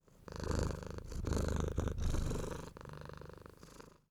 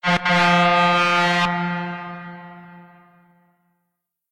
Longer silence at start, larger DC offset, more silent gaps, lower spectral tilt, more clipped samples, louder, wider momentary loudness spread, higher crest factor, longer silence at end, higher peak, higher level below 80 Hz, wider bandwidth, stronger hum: about the same, 0.15 s vs 0.05 s; neither; neither; about the same, -6 dB/octave vs -5 dB/octave; neither; second, -41 LUFS vs -17 LUFS; about the same, 18 LU vs 20 LU; about the same, 20 dB vs 18 dB; second, 0.2 s vs 1.5 s; second, -20 dBFS vs -4 dBFS; first, -42 dBFS vs -58 dBFS; first, 16 kHz vs 11.5 kHz; neither